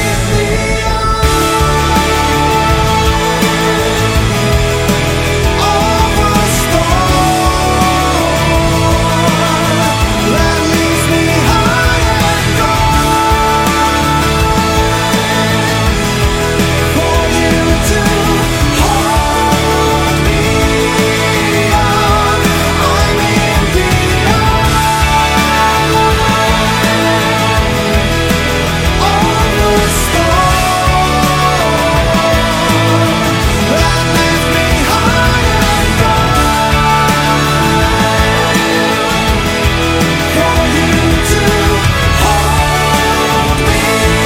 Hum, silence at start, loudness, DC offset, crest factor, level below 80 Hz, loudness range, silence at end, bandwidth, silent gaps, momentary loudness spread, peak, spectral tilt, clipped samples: none; 0 s; -10 LUFS; under 0.1%; 10 dB; -18 dBFS; 1 LU; 0 s; 16.5 kHz; none; 2 LU; 0 dBFS; -4.5 dB/octave; under 0.1%